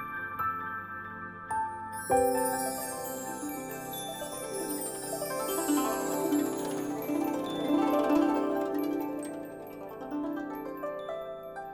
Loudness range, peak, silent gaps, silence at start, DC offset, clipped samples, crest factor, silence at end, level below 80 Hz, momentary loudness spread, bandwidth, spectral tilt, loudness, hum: 5 LU; -14 dBFS; none; 0 s; under 0.1%; under 0.1%; 18 dB; 0 s; -62 dBFS; 13 LU; 17 kHz; -4 dB/octave; -32 LUFS; none